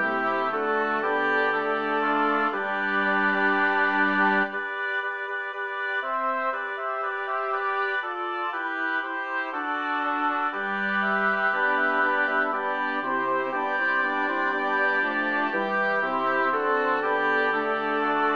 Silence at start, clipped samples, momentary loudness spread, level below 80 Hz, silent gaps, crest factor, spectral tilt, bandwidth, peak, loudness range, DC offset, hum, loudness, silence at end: 0 s; under 0.1%; 6 LU; -76 dBFS; none; 16 dB; -6 dB/octave; 7 kHz; -10 dBFS; 4 LU; 0.2%; none; -25 LUFS; 0 s